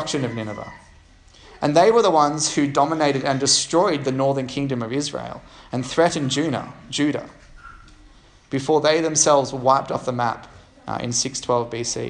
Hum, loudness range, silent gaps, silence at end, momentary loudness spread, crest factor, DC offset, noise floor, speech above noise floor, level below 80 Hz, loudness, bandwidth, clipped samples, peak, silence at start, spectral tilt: none; 6 LU; none; 0 s; 15 LU; 20 dB; under 0.1%; -50 dBFS; 29 dB; -52 dBFS; -20 LUFS; 10.5 kHz; under 0.1%; -2 dBFS; 0 s; -3.5 dB/octave